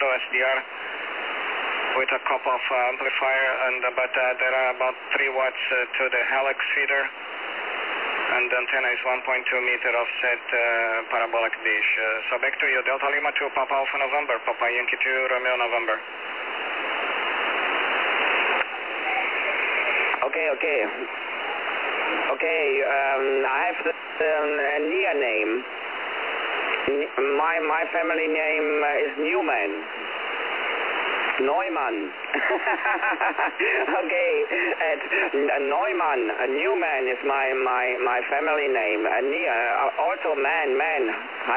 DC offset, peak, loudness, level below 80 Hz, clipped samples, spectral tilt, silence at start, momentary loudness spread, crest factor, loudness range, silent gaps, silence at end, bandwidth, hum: 0.1%; -8 dBFS; -23 LUFS; -72 dBFS; under 0.1%; -5 dB/octave; 0 s; 6 LU; 16 dB; 2 LU; none; 0 s; 4 kHz; none